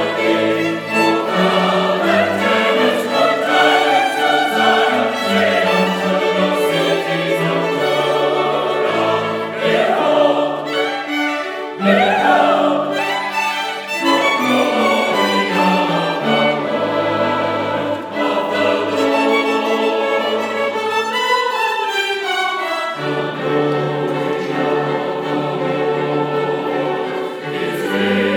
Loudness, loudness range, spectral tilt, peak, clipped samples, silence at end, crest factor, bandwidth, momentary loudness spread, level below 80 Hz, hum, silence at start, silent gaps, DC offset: -16 LUFS; 5 LU; -4.5 dB/octave; 0 dBFS; under 0.1%; 0 s; 16 dB; 20 kHz; 6 LU; -72 dBFS; none; 0 s; none; under 0.1%